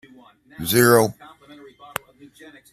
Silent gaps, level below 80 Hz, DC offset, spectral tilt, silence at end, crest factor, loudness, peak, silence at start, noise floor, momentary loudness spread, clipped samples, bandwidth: none; -58 dBFS; under 0.1%; -4.5 dB/octave; 1.6 s; 22 dB; -18 LUFS; 0 dBFS; 0.6 s; -50 dBFS; 18 LU; under 0.1%; 15.5 kHz